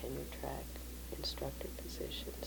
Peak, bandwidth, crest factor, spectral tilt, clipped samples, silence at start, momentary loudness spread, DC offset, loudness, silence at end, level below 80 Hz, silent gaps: -28 dBFS; 19 kHz; 16 dB; -4 dB/octave; under 0.1%; 0 s; 6 LU; under 0.1%; -44 LUFS; 0 s; -48 dBFS; none